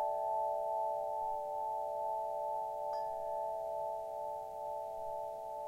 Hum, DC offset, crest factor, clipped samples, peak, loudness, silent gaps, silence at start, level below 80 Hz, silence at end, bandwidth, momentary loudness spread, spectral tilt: none; under 0.1%; 12 dB; under 0.1%; -26 dBFS; -39 LUFS; none; 0 s; -72 dBFS; 0 s; 16.5 kHz; 6 LU; -4.5 dB/octave